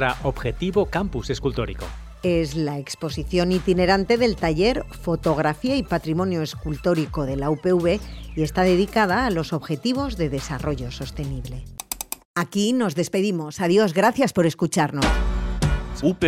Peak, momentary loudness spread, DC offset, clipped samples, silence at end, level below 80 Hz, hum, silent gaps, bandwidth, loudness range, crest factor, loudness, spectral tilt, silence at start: -6 dBFS; 11 LU; under 0.1%; under 0.1%; 0 s; -34 dBFS; none; 12.25-12.34 s; 16 kHz; 4 LU; 16 dB; -23 LUFS; -5.5 dB/octave; 0 s